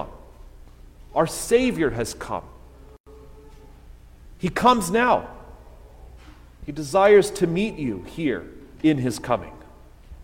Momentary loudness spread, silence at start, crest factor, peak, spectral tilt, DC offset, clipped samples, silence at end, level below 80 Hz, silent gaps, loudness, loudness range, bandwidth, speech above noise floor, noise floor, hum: 16 LU; 0 s; 20 dB; -4 dBFS; -5 dB/octave; under 0.1%; under 0.1%; 0 s; -44 dBFS; 3.00-3.04 s; -22 LUFS; 5 LU; 16.5 kHz; 25 dB; -46 dBFS; none